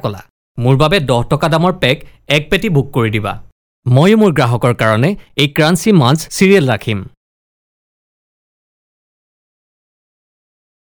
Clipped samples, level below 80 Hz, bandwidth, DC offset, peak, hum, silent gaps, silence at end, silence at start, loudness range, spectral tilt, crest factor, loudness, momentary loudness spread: 0.3%; -38 dBFS; over 20 kHz; under 0.1%; 0 dBFS; none; 0.30-0.55 s, 3.52-3.83 s; 3.8 s; 0.05 s; 6 LU; -6 dB/octave; 14 dB; -13 LUFS; 12 LU